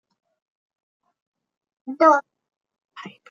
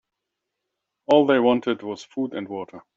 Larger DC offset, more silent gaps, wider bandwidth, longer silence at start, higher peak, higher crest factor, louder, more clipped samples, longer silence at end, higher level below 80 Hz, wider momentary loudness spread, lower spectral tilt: neither; first, 2.57-2.61 s vs none; about the same, 7.2 kHz vs 7.6 kHz; first, 1.85 s vs 1.1 s; about the same, -2 dBFS vs -4 dBFS; about the same, 24 dB vs 20 dB; first, -18 LUFS vs -22 LUFS; neither; about the same, 0.2 s vs 0.15 s; second, under -90 dBFS vs -70 dBFS; first, 24 LU vs 16 LU; second, -4.5 dB/octave vs -6 dB/octave